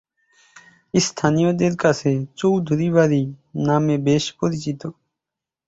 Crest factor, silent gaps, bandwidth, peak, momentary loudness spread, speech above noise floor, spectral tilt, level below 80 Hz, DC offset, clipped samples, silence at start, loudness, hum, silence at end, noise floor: 18 dB; none; 8 kHz; -2 dBFS; 9 LU; 67 dB; -6 dB/octave; -56 dBFS; under 0.1%; under 0.1%; 0.95 s; -20 LUFS; none; 0.75 s; -86 dBFS